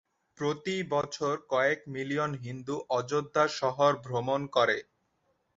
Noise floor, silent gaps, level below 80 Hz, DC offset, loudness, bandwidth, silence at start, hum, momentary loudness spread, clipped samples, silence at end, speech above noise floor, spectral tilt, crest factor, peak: -75 dBFS; none; -70 dBFS; under 0.1%; -30 LUFS; 7.8 kHz; 0.4 s; none; 7 LU; under 0.1%; 0.75 s; 45 dB; -5 dB/octave; 20 dB; -12 dBFS